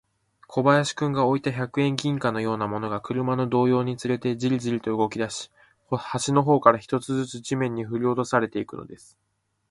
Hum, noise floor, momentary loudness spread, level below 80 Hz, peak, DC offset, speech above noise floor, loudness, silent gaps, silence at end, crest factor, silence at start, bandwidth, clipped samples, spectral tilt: none; -55 dBFS; 10 LU; -62 dBFS; 0 dBFS; under 0.1%; 31 dB; -24 LUFS; none; 0.75 s; 24 dB; 0.5 s; 11.5 kHz; under 0.1%; -6 dB/octave